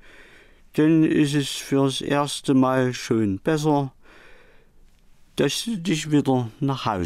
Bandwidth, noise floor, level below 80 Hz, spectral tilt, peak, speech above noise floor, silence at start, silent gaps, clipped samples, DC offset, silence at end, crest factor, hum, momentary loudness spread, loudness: 15.5 kHz; -52 dBFS; -54 dBFS; -5.5 dB/octave; -10 dBFS; 31 dB; 0.2 s; none; under 0.1%; under 0.1%; 0 s; 12 dB; none; 7 LU; -22 LUFS